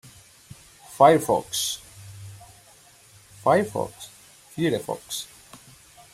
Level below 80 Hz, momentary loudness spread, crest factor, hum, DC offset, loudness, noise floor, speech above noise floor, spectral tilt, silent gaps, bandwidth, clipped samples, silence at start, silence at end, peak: -62 dBFS; 26 LU; 24 dB; none; under 0.1%; -23 LUFS; -53 dBFS; 31 dB; -4 dB/octave; none; 16 kHz; under 0.1%; 0.9 s; 0.55 s; -2 dBFS